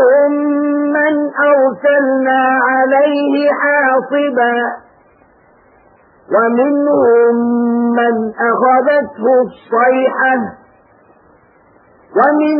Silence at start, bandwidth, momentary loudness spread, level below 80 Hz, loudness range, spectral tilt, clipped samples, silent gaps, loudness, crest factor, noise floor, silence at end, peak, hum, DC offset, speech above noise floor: 0 s; 5.2 kHz; 5 LU; -62 dBFS; 4 LU; -10.5 dB/octave; under 0.1%; none; -12 LUFS; 12 dB; -48 dBFS; 0 s; 0 dBFS; none; under 0.1%; 36 dB